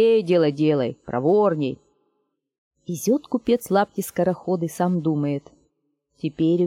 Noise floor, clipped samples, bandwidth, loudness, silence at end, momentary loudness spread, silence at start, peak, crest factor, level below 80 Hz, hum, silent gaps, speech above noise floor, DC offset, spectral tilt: -73 dBFS; under 0.1%; 17 kHz; -22 LUFS; 0 s; 13 LU; 0 s; -6 dBFS; 16 dB; -62 dBFS; none; 2.58-2.71 s; 52 dB; under 0.1%; -6.5 dB/octave